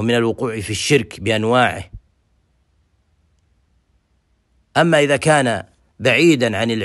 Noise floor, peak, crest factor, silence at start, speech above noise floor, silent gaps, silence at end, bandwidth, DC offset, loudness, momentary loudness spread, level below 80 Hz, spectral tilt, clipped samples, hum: -63 dBFS; 0 dBFS; 18 dB; 0 s; 47 dB; none; 0 s; 12.5 kHz; under 0.1%; -16 LUFS; 9 LU; -50 dBFS; -4.5 dB/octave; under 0.1%; none